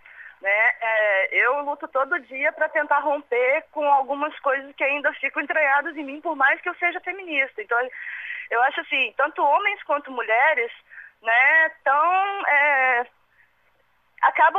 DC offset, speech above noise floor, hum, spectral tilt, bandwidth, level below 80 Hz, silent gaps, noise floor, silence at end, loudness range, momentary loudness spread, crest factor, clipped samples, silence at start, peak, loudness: under 0.1%; 43 dB; 60 Hz at -75 dBFS; -2.5 dB/octave; 7.2 kHz; -76 dBFS; none; -65 dBFS; 0 s; 4 LU; 9 LU; 18 dB; under 0.1%; 0.15 s; -6 dBFS; -21 LUFS